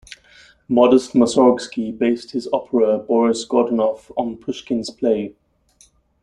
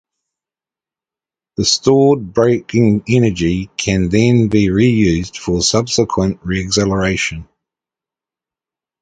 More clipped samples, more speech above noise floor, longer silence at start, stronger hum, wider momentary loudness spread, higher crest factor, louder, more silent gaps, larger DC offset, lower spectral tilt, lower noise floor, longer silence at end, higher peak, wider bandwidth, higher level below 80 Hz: neither; second, 38 dB vs 76 dB; second, 0.1 s vs 1.6 s; neither; first, 11 LU vs 7 LU; about the same, 18 dB vs 16 dB; second, -19 LUFS vs -14 LUFS; neither; neither; about the same, -5.5 dB/octave vs -5 dB/octave; second, -55 dBFS vs -89 dBFS; second, 0.9 s vs 1.6 s; about the same, -2 dBFS vs 0 dBFS; first, 11 kHz vs 9.4 kHz; second, -58 dBFS vs -36 dBFS